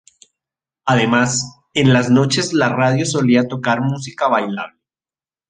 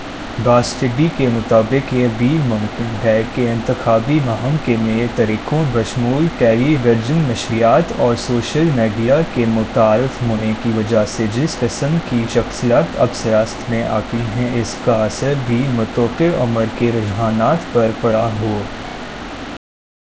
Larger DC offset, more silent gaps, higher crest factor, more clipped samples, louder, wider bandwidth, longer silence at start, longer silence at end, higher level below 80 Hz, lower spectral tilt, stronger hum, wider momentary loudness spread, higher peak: second, under 0.1% vs 0.3%; neither; about the same, 16 dB vs 16 dB; neither; about the same, -16 LUFS vs -16 LUFS; first, 9.6 kHz vs 8 kHz; first, 0.85 s vs 0 s; first, 0.8 s vs 0.6 s; second, -56 dBFS vs -38 dBFS; second, -5 dB/octave vs -6.5 dB/octave; neither; first, 9 LU vs 6 LU; about the same, -2 dBFS vs 0 dBFS